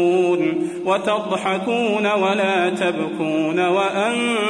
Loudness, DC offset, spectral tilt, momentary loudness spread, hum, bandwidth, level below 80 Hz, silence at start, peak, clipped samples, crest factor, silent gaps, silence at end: -19 LUFS; under 0.1%; -5 dB/octave; 4 LU; none; 10.5 kHz; -66 dBFS; 0 s; -6 dBFS; under 0.1%; 14 dB; none; 0 s